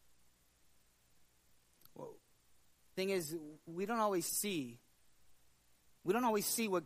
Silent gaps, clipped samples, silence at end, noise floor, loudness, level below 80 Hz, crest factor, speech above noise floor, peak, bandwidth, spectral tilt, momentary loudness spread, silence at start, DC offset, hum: none; under 0.1%; 0 s; -71 dBFS; -37 LUFS; -80 dBFS; 20 dB; 34 dB; -22 dBFS; 15.5 kHz; -3.5 dB/octave; 18 LU; 1.85 s; under 0.1%; none